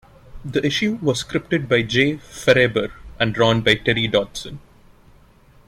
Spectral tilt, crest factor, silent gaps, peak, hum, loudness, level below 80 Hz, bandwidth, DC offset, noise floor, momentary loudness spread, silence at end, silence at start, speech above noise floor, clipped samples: -5 dB/octave; 20 dB; none; -2 dBFS; none; -19 LUFS; -46 dBFS; 15 kHz; under 0.1%; -51 dBFS; 13 LU; 1.1 s; 0.35 s; 31 dB; under 0.1%